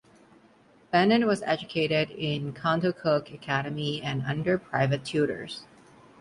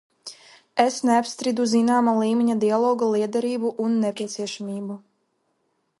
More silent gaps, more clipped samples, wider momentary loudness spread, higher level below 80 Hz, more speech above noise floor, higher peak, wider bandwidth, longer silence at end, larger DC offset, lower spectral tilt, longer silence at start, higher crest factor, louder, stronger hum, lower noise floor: neither; neither; second, 8 LU vs 14 LU; first, -62 dBFS vs -74 dBFS; second, 32 dB vs 50 dB; second, -8 dBFS vs -4 dBFS; about the same, 11.5 kHz vs 11.5 kHz; second, 0.55 s vs 1 s; neither; first, -6.5 dB/octave vs -5 dB/octave; first, 0.9 s vs 0.25 s; about the same, 20 dB vs 18 dB; second, -27 LUFS vs -22 LUFS; neither; second, -58 dBFS vs -72 dBFS